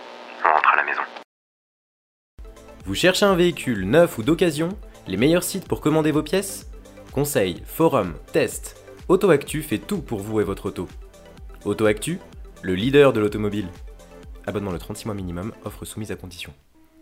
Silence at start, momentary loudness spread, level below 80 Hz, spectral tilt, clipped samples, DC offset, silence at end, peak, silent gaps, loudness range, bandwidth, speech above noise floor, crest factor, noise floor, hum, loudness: 0 s; 17 LU; -44 dBFS; -5 dB/octave; under 0.1%; under 0.1%; 0.5 s; 0 dBFS; 1.24-2.38 s; 6 LU; 16 kHz; 20 dB; 22 dB; -42 dBFS; none; -22 LUFS